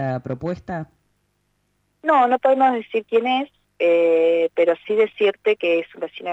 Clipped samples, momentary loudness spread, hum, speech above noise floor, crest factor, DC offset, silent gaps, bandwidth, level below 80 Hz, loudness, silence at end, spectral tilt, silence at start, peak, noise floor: under 0.1%; 13 LU; 50 Hz at -70 dBFS; 49 dB; 14 dB; under 0.1%; none; 7.6 kHz; -60 dBFS; -20 LUFS; 0 s; -7 dB/octave; 0 s; -6 dBFS; -69 dBFS